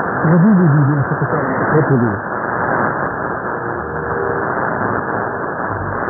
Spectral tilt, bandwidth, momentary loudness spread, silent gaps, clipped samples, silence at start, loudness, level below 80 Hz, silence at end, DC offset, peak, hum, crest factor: -17 dB/octave; 2.3 kHz; 9 LU; none; under 0.1%; 0 s; -16 LUFS; -44 dBFS; 0 s; under 0.1%; 0 dBFS; none; 16 dB